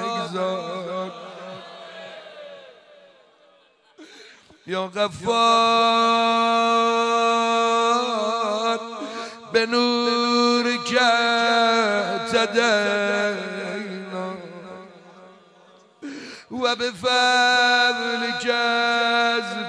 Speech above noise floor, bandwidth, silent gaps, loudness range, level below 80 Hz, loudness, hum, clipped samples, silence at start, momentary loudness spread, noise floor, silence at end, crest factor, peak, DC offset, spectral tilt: 37 dB; 10.5 kHz; none; 14 LU; -68 dBFS; -20 LUFS; none; under 0.1%; 0 s; 20 LU; -57 dBFS; 0 s; 16 dB; -6 dBFS; under 0.1%; -3 dB/octave